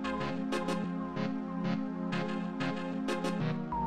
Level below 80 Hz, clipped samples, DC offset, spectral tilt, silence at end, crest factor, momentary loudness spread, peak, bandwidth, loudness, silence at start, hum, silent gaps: -58 dBFS; under 0.1%; 0.3%; -6.5 dB/octave; 0 s; 14 dB; 2 LU; -20 dBFS; 12.5 kHz; -35 LUFS; 0 s; none; none